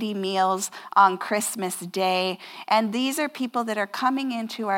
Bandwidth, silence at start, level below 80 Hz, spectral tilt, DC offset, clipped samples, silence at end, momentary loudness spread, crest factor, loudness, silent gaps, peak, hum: 17 kHz; 0 s; under -90 dBFS; -3.5 dB/octave; under 0.1%; under 0.1%; 0 s; 10 LU; 20 dB; -24 LUFS; none; -4 dBFS; none